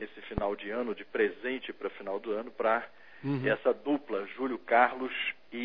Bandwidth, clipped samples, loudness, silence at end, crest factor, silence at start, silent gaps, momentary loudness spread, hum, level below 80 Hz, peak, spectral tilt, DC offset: 5.4 kHz; under 0.1%; -32 LUFS; 0 s; 22 dB; 0 s; none; 11 LU; none; -56 dBFS; -10 dBFS; -8.5 dB/octave; 0.2%